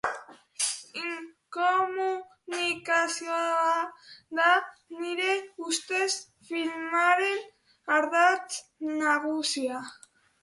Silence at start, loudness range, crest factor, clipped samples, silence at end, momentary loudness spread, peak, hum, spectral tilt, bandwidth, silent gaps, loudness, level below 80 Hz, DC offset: 0.05 s; 2 LU; 20 dB; under 0.1%; 0.5 s; 14 LU; -10 dBFS; none; -0.5 dB/octave; 11.5 kHz; none; -28 LUFS; -78 dBFS; under 0.1%